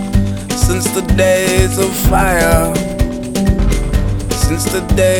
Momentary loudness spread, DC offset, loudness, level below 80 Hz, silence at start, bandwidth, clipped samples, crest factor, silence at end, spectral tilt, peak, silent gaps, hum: 6 LU; under 0.1%; -14 LUFS; -18 dBFS; 0 s; over 20 kHz; under 0.1%; 12 dB; 0 s; -5 dB/octave; 0 dBFS; none; none